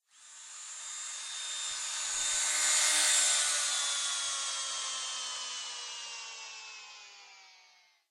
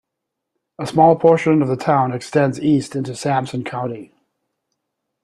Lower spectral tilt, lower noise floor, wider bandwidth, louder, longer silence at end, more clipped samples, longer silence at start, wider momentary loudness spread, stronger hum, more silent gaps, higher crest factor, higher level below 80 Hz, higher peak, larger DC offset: second, 4.5 dB/octave vs -7 dB/octave; second, -64 dBFS vs -80 dBFS; first, 16 kHz vs 12 kHz; second, -30 LUFS vs -17 LUFS; second, 0.55 s vs 1.2 s; neither; second, 0.2 s vs 0.8 s; first, 20 LU vs 13 LU; neither; neither; about the same, 20 dB vs 18 dB; second, -78 dBFS vs -58 dBFS; second, -14 dBFS vs 0 dBFS; neither